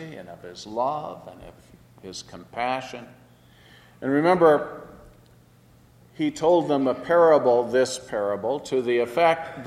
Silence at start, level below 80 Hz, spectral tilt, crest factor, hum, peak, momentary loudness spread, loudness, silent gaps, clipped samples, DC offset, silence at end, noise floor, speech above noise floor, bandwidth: 0 s; -60 dBFS; -5.5 dB/octave; 18 dB; none; -6 dBFS; 22 LU; -22 LUFS; none; under 0.1%; under 0.1%; 0 s; -55 dBFS; 32 dB; 13 kHz